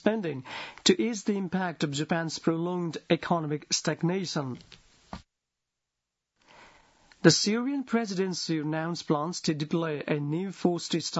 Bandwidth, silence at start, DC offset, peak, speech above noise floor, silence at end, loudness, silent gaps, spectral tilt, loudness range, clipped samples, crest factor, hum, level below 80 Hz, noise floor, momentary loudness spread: 8 kHz; 0.05 s; under 0.1%; -4 dBFS; 58 dB; 0 s; -29 LUFS; none; -4.5 dB/octave; 6 LU; under 0.1%; 26 dB; none; -68 dBFS; -86 dBFS; 10 LU